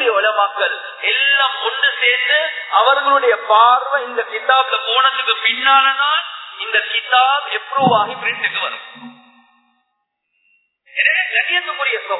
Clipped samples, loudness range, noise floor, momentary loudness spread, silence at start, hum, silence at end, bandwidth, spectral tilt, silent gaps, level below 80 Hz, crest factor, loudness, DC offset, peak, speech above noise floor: under 0.1%; 7 LU; -72 dBFS; 8 LU; 0 s; none; 0 s; 4.1 kHz; -5 dB/octave; none; -82 dBFS; 16 dB; -15 LUFS; under 0.1%; 0 dBFS; 56 dB